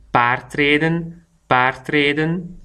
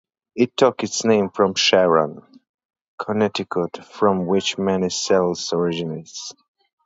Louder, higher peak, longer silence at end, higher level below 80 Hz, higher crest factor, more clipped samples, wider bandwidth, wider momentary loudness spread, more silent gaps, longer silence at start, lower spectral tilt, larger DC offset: about the same, -18 LUFS vs -20 LUFS; about the same, 0 dBFS vs -2 dBFS; second, 0 s vs 0.55 s; first, -48 dBFS vs -58 dBFS; about the same, 18 dB vs 20 dB; neither; first, 11.5 kHz vs 8 kHz; second, 7 LU vs 14 LU; second, none vs 2.49-2.58 s, 2.65-2.69 s, 2.81-2.98 s; second, 0.15 s vs 0.35 s; first, -6.5 dB/octave vs -4 dB/octave; neither